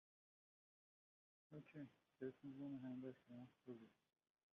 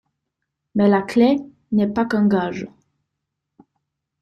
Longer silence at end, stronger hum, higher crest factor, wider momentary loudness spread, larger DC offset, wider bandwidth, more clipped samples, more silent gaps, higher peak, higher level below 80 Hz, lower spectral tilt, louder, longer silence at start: second, 0.6 s vs 1.55 s; neither; about the same, 20 dB vs 16 dB; about the same, 10 LU vs 11 LU; neither; second, 6.2 kHz vs 9 kHz; neither; neither; second, -40 dBFS vs -4 dBFS; second, under -90 dBFS vs -58 dBFS; about the same, -8 dB/octave vs -8 dB/octave; second, -57 LUFS vs -19 LUFS; first, 1.5 s vs 0.75 s